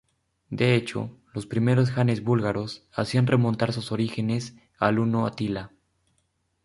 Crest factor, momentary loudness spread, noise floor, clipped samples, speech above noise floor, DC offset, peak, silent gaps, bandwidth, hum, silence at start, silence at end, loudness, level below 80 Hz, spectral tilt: 22 dB; 12 LU; -72 dBFS; under 0.1%; 48 dB; under 0.1%; -4 dBFS; none; 11.5 kHz; none; 0.5 s; 0.95 s; -25 LUFS; -56 dBFS; -7 dB/octave